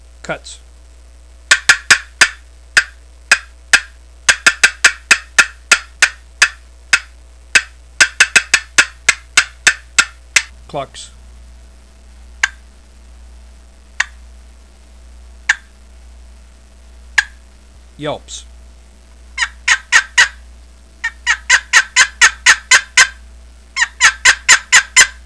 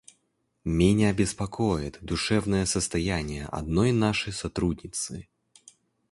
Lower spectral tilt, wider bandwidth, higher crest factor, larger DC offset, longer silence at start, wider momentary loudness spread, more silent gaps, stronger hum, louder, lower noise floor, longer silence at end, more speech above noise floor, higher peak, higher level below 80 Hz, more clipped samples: second, 1.5 dB/octave vs -5 dB/octave; about the same, 11 kHz vs 11.5 kHz; about the same, 16 dB vs 18 dB; first, 0.3% vs under 0.1%; second, 0.3 s vs 0.65 s; first, 17 LU vs 10 LU; neither; neither; first, -12 LUFS vs -27 LUFS; second, -41 dBFS vs -74 dBFS; second, 0.15 s vs 0.9 s; second, 15 dB vs 48 dB; first, 0 dBFS vs -8 dBFS; about the same, -40 dBFS vs -42 dBFS; first, 0.5% vs under 0.1%